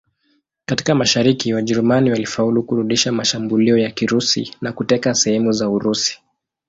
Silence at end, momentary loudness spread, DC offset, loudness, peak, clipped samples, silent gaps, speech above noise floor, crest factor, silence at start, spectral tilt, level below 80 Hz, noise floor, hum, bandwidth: 0.55 s; 6 LU; under 0.1%; -17 LUFS; -2 dBFS; under 0.1%; none; 47 dB; 16 dB; 0.7 s; -4 dB/octave; -54 dBFS; -64 dBFS; none; 7.8 kHz